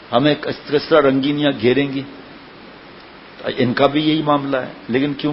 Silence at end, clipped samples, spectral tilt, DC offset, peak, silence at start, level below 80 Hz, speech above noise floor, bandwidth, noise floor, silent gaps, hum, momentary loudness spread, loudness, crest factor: 0 s; under 0.1%; -9 dB/octave; under 0.1%; 0 dBFS; 0 s; -54 dBFS; 23 dB; 5.8 kHz; -40 dBFS; none; none; 13 LU; -18 LUFS; 18 dB